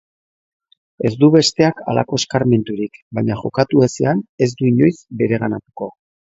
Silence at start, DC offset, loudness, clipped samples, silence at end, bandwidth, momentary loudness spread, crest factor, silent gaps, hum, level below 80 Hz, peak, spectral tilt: 1 s; under 0.1%; -17 LUFS; under 0.1%; 0.4 s; 8 kHz; 12 LU; 18 dB; 3.02-3.11 s, 4.29-4.38 s; none; -52 dBFS; 0 dBFS; -6 dB/octave